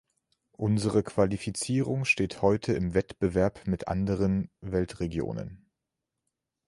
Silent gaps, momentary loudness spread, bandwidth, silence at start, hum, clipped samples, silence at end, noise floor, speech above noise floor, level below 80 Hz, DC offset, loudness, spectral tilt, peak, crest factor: none; 7 LU; 11.5 kHz; 0.6 s; none; under 0.1%; 1.1 s; -86 dBFS; 58 dB; -48 dBFS; under 0.1%; -29 LUFS; -6.5 dB/octave; -10 dBFS; 20 dB